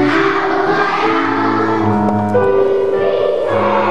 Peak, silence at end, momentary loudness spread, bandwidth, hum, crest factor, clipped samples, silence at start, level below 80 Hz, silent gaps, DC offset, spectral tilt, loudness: 0 dBFS; 0 s; 2 LU; 9.2 kHz; none; 14 dB; under 0.1%; 0 s; -50 dBFS; none; 2%; -7 dB/octave; -14 LUFS